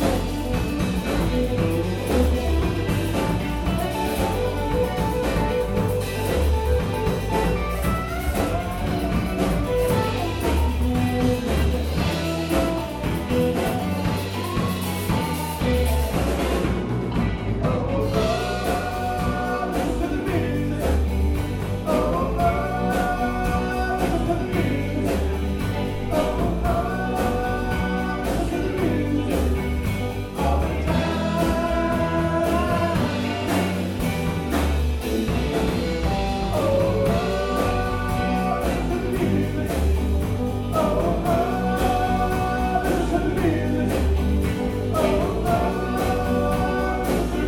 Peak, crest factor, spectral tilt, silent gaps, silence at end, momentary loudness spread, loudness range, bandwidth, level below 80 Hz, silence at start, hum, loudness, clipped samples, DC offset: -6 dBFS; 16 dB; -6.5 dB/octave; none; 0 s; 3 LU; 2 LU; 17.5 kHz; -28 dBFS; 0 s; none; -23 LUFS; under 0.1%; under 0.1%